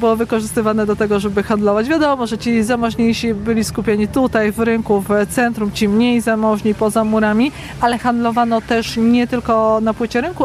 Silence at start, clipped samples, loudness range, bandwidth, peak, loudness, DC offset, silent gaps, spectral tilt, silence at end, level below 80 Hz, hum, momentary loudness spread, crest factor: 0 s; under 0.1%; 1 LU; 14.5 kHz; -4 dBFS; -16 LUFS; under 0.1%; none; -5.5 dB/octave; 0 s; -40 dBFS; none; 3 LU; 12 dB